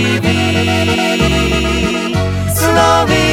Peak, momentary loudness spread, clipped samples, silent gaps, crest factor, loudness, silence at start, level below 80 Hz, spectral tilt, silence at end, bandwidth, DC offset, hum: 0 dBFS; 6 LU; under 0.1%; none; 12 dB; -13 LUFS; 0 s; -26 dBFS; -4.5 dB/octave; 0 s; 17 kHz; under 0.1%; none